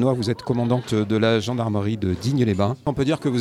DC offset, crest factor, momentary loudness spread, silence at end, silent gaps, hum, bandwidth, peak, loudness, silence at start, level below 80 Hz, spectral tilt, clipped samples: under 0.1%; 16 dB; 4 LU; 0 s; none; none; 13 kHz; -6 dBFS; -22 LUFS; 0 s; -50 dBFS; -7 dB/octave; under 0.1%